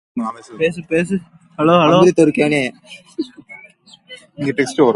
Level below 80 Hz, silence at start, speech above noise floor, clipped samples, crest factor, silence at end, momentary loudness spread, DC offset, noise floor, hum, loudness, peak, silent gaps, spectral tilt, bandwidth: -56 dBFS; 0.15 s; 30 dB; under 0.1%; 16 dB; 0 s; 17 LU; under 0.1%; -46 dBFS; none; -16 LUFS; 0 dBFS; none; -6 dB/octave; 11.5 kHz